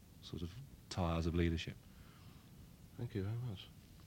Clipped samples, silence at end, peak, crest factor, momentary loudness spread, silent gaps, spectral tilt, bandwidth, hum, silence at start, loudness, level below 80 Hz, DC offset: under 0.1%; 0 s; -22 dBFS; 20 dB; 22 LU; none; -6.5 dB/octave; 16.5 kHz; none; 0 s; -42 LUFS; -54 dBFS; under 0.1%